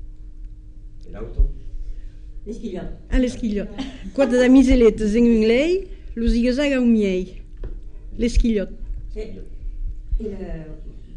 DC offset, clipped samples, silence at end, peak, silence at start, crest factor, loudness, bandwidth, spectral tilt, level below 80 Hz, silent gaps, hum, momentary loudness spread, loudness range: under 0.1%; under 0.1%; 0 s; -4 dBFS; 0 s; 16 dB; -20 LUFS; 10 kHz; -6.5 dB/octave; -28 dBFS; none; none; 23 LU; 11 LU